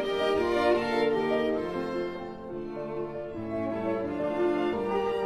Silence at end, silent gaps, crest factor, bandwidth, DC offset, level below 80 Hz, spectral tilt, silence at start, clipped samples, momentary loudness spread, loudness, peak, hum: 0 s; none; 16 dB; 12 kHz; under 0.1%; -54 dBFS; -6 dB/octave; 0 s; under 0.1%; 11 LU; -29 LUFS; -12 dBFS; none